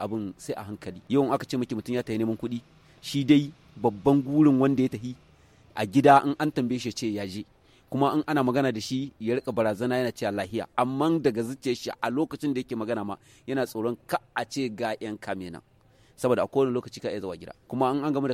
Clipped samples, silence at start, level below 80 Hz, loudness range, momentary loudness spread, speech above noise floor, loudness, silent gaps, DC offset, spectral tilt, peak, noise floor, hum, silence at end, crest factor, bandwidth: under 0.1%; 0 s; -62 dBFS; 7 LU; 15 LU; 30 dB; -27 LUFS; none; under 0.1%; -6.5 dB/octave; -4 dBFS; -57 dBFS; none; 0 s; 22 dB; 15.5 kHz